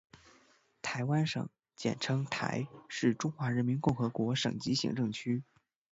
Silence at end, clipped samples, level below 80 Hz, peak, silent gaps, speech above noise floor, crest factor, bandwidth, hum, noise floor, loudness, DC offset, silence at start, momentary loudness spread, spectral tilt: 0.5 s; under 0.1%; -66 dBFS; -16 dBFS; none; 34 dB; 18 dB; 8 kHz; none; -67 dBFS; -34 LUFS; under 0.1%; 0.85 s; 7 LU; -5.5 dB/octave